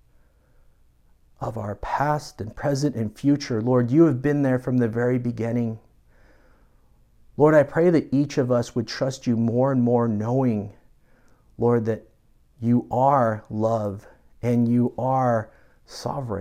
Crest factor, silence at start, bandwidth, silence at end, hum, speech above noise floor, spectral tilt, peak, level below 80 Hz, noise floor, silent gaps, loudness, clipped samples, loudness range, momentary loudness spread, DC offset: 18 dB; 1.4 s; 13 kHz; 0 s; none; 36 dB; -7.5 dB/octave; -4 dBFS; -52 dBFS; -58 dBFS; none; -23 LUFS; under 0.1%; 4 LU; 13 LU; under 0.1%